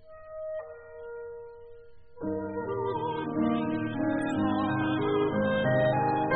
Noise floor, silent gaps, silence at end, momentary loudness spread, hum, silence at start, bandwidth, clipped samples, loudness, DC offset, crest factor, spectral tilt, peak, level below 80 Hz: -52 dBFS; none; 0 s; 18 LU; none; 0.05 s; 4.5 kHz; under 0.1%; -29 LUFS; under 0.1%; 18 dB; -5.5 dB/octave; -12 dBFS; -58 dBFS